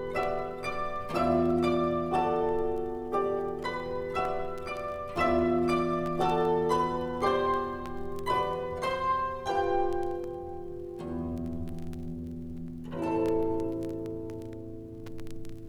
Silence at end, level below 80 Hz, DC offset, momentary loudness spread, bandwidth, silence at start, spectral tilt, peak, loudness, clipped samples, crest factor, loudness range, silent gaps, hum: 0 s; -48 dBFS; under 0.1%; 13 LU; 15 kHz; 0 s; -7 dB/octave; -14 dBFS; -31 LUFS; under 0.1%; 16 dB; 6 LU; none; none